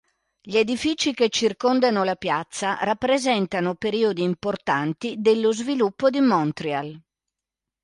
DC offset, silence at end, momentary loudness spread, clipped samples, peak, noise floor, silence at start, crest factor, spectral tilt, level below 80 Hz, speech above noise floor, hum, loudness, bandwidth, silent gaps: under 0.1%; 0.85 s; 6 LU; under 0.1%; -6 dBFS; -87 dBFS; 0.45 s; 16 dB; -4.5 dB/octave; -62 dBFS; 65 dB; none; -22 LUFS; 11.5 kHz; none